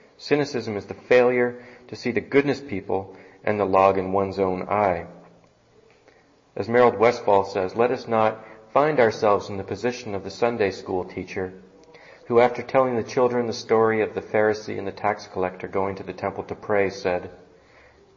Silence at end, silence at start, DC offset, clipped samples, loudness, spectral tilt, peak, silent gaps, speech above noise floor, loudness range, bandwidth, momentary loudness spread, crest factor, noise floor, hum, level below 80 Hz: 0.8 s; 0.2 s; under 0.1%; under 0.1%; -23 LUFS; -6 dB/octave; -4 dBFS; none; 34 dB; 4 LU; 7.6 kHz; 13 LU; 18 dB; -56 dBFS; none; -60 dBFS